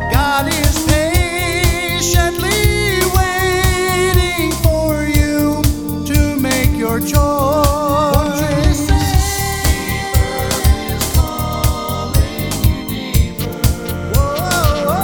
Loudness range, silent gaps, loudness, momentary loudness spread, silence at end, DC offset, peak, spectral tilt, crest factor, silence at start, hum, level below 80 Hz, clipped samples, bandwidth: 3 LU; none; -15 LUFS; 4 LU; 0 s; under 0.1%; 0 dBFS; -4.5 dB/octave; 14 dB; 0 s; none; -20 dBFS; under 0.1%; over 20 kHz